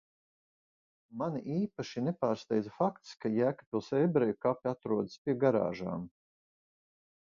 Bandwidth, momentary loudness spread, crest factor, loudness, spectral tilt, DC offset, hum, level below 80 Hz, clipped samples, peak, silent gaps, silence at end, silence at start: 7.4 kHz; 9 LU; 20 dB; -33 LUFS; -8 dB/octave; under 0.1%; none; -70 dBFS; under 0.1%; -14 dBFS; 3.66-3.72 s, 5.18-5.25 s; 1.2 s; 1.1 s